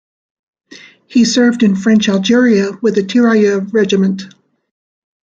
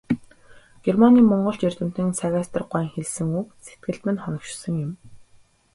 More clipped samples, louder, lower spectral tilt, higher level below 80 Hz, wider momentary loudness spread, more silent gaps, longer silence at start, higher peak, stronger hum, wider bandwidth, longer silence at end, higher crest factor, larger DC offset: neither; first, -12 LUFS vs -22 LUFS; second, -5.5 dB/octave vs -7 dB/octave; about the same, -58 dBFS vs -56 dBFS; second, 5 LU vs 16 LU; neither; first, 0.7 s vs 0.1 s; about the same, -2 dBFS vs -2 dBFS; neither; second, 7.8 kHz vs 11.5 kHz; first, 0.95 s vs 0.5 s; second, 12 dB vs 20 dB; neither